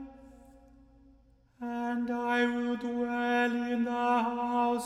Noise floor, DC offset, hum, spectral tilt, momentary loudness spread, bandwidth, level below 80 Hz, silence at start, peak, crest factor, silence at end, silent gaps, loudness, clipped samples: -62 dBFS; under 0.1%; none; -4.5 dB/octave; 7 LU; 11 kHz; -64 dBFS; 0 s; -16 dBFS; 14 dB; 0 s; none; -30 LUFS; under 0.1%